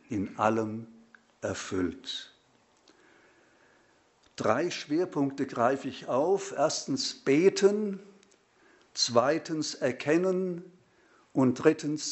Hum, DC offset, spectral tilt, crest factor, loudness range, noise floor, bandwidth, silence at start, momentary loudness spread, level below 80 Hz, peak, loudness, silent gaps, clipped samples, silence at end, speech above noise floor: none; under 0.1%; -4.5 dB/octave; 22 dB; 10 LU; -65 dBFS; 8.2 kHz; 0.1 s; 12 LU; -70 dBFS; -8 dBFS; -29 LUFS; none; under 0.1%; 0 s; 37 dB